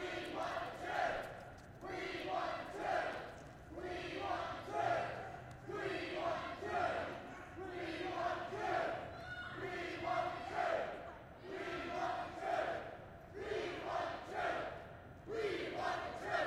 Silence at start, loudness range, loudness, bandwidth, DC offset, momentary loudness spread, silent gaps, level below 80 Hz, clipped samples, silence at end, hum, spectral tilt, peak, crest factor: 0 s; 2 LU; -42 LUFS; 16 kHz; under 0.1%; 11 LU; none; -66 dBFS; under 0.1%; 0 s; none; -5 dB/octave; -26 dBFS; 16 dB